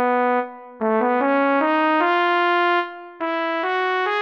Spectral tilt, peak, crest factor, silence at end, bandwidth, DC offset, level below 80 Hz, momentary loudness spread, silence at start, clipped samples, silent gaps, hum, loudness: -5.5 dB/octave; -6 dBFS; 14 dB; 0 s; 6.6 kHz; under 0.1%; -76 dBFS; 8 LU; 0 s; under 0.1%; none; none; -20 LUFS